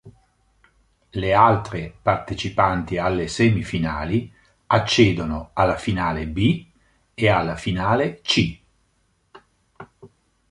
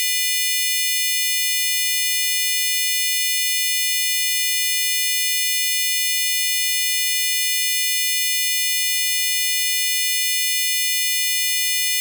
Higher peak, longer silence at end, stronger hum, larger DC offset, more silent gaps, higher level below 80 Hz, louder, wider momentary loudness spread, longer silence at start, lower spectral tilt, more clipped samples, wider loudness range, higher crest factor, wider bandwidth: first, -2 dBFS vs -8 dBFS; first, 0.45 s vs 0 s; neither; neither; neither; first, -42 dBFS vs under -90 dBFS; second, -21 LUFS vs -17 LUFS; first, 10 LU vs 0 LU; about the same, 0.05 s vs 0 s; first, -6 dB/octave vs 16 dB/octave; neither; first, 3 LU vs 0 LU; first, 20 dB vs 12 dB; second, 11 kHz vs over 20 kHz